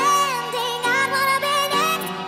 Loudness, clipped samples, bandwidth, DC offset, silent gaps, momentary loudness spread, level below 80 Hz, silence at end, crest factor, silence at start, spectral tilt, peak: -20 LUFS; under 0.1%; 16 kHz; under 0.1%; none; 4 LU; -64 dBFS; 0 s; 12 dB; 0 s; -1.5 dB/octave; -8 dBFS